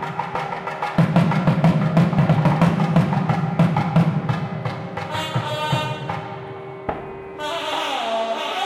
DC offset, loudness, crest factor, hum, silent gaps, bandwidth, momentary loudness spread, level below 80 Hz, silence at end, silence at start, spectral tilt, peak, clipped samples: under 0.1%; -21 LUFS; 18 dB; none; none; 12 kHz; 12 LU; -50 dBFS; 0 s; 0 s; -7 dB/octave; -4 dBFS; under 0.1%